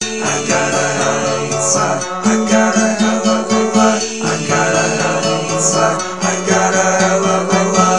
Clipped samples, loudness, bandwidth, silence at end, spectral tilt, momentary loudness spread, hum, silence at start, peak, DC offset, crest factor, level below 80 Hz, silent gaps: under 0.1%; -14 LUFS; 11.5 kHz; 0 s; -3.5 dB/octave; 5 LU; none; 0 s; 0 dBFS; 1%; 14 dB; -60 dBFS; none